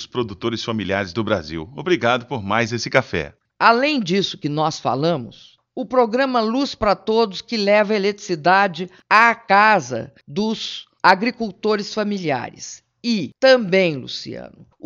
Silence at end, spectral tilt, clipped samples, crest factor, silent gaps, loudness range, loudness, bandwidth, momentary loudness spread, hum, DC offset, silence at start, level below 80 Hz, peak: 0.4 s; -5 dB/octave; under 0.1%; 20 dB; none; 4 LU; -19 LUFS; 7.6 kHz; 14 LU; none; under 0.1%; 0 s; -52 dBFS; 0 dBFS